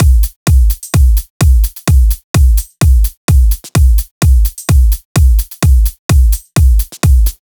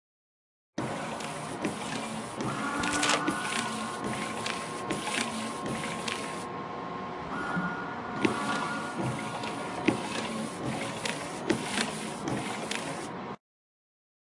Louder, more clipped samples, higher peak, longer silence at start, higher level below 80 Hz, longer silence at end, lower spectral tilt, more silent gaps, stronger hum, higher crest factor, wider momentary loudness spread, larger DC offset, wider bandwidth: first, -12 LUFS vs -32 LUFS; neither; first, 0 dBFS vs -6 dBFS; second, 0 s vs 0.75 s; first, -10 dBFS vs -64 dBFS; second, 0.15 s vs 0.95 s; first, -5.5 dB/octave vs -3.5 dB/octave; first, 0.36-0.46 s, 1.30-1.40 s, 2.24-2.34 s, 3.17-3.28 s, 4.11-4.21 s, 5.05-5.15 s, 5.99-6.09 s vs none; neither; second, 8 dB vs 26 dB; second, 2 LU vs 8 LU; neither; first, over 20 kHz vs 11.5 kHz